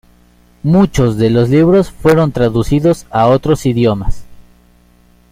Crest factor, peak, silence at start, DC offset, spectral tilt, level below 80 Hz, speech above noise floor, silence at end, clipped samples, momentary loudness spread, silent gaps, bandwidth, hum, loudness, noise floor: 12 dB; 0 dBFS; 0.65 s; under 0.1%; -7.5 dB/octave; -28 dBFS; 37 dB; 0.9 s; under 0.1%; 4 LU; none; 16 kHz; 60 Hz at -35 dBFS; -12 LUFS; -48 dBFS